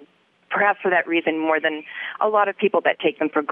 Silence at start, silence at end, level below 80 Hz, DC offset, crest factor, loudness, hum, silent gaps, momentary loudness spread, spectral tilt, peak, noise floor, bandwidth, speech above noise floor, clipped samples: 0 s; 0 s; -82 dBFS; under 0.1%; 16 dB; -21 LUFS; none; none; 6 LU; -8 dB/octave; -4 dBFS; -54 dBFS; 3.8 kHz; 33 dB; under 0.1%